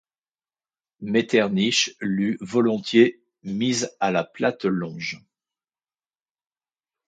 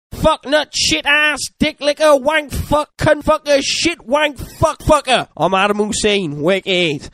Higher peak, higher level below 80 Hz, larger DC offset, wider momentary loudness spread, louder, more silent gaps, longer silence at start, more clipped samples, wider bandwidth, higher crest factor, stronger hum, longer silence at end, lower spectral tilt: second, -4 dBFS vs 0 dBFS; second, -66 dBFS vs -34 dBFS; neither; first, 13 LU vs 6 LU; second, -23 LUFS vs -15 LUFS; neither; first, 1 s vs 0.1 s; neither; second, 9.2 kHz vs 15.5 kHz; about the same, 20 dB vs 16 dB; neither; first, 1.9 s vs 0.05 s; about the same, -4.5 dB/octave vs -3.5 dB/octave